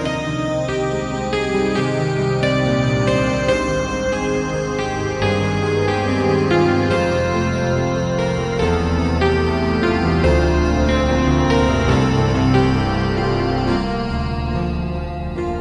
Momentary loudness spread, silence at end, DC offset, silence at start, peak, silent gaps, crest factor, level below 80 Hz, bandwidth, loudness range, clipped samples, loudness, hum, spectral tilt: 6 LU; 0 s; under 0.1%; 0 s; -4 dBFS; none; 14 dB; -28 dBFS; 11 kHz; 3 LU; under 0.1%; -18 LUFS; none; -6.5 dB/octave